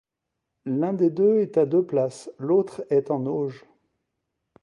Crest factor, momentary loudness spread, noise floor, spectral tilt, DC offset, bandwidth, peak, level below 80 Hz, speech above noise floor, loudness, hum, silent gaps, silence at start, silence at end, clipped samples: 14 dB; 9 LU; -82 dBFS; -8.5 dB/octave; under 0.1%; 11 kHz; -10 dBFS; -74 dBFS; 60 dB; -24 LUFS; none; none; 0.65 s; 1.05 s; under 0.1%